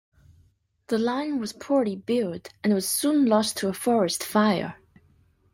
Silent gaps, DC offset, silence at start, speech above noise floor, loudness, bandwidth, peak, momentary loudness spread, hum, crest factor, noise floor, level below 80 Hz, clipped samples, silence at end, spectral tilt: none; under 0.1%; 0.9 s; 39 dB; -25 LUFS; 16.5 kHz; -10 dBFS; 8 LU; none; 16 dB; -63 dBFS; -66 dBFS; under 0.1%; 0.8 s; -4.5 dB/octave